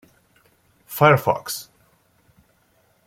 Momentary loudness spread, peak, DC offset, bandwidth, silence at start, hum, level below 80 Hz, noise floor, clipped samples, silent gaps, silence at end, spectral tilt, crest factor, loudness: 16 LU; -2 dBFS; under 0.1%; 16.5 kHz; 0.9 s; none; -60 dBFS; -62 dBFS; under 0.1%; none; 1.45 s; -5 dB/octave; 22 dB; -19 LUFS